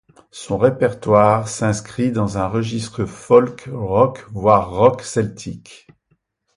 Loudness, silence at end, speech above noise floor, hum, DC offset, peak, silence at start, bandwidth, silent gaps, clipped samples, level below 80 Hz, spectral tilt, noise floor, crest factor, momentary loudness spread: -18 LUFS; 0.8 s; 48 dB; none; under 0.1%; 0 dBFS; 0.35 s; 11.5 kHz; none; under 0.1%; -46 dBFS; -6.5 dB/octave; -65 dBFS; 18 dB; 12 LU